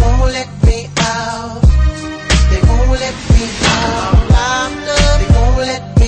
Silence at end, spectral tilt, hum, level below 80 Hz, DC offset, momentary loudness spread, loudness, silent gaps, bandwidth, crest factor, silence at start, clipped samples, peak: 0 s; -5 dB/octave; none; -14 dBFS; under 0.1%; 6 LU; -13 LUFS; none; 9.4 kHz; 12 dB; 0 s; under 0.1%; 0 dBFS